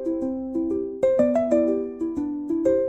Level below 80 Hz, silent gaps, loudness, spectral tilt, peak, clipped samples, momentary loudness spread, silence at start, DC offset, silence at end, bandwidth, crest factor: -54 dBFS; none; -24 LUFS; -8 dB/octave; -8 dBFS; under 0.1%; 8 LU; 0 s; 0.1%; 0 s; 8.2 kHz; 16 dB